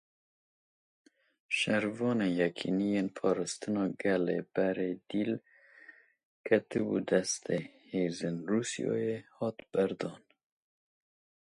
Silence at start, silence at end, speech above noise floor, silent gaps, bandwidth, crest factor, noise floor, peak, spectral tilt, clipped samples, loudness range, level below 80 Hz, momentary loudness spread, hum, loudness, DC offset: 1.5 s; 1.35 s; 26 dB; 6.25-6.44 s; 11.5 kHz; 22 dB; -58 dBFS; -12 dBFS; -5 dB/octave; under 0.1%; 4 LU; -72 dBFS; 7 LU; none; -33 LUFS; under 0.1%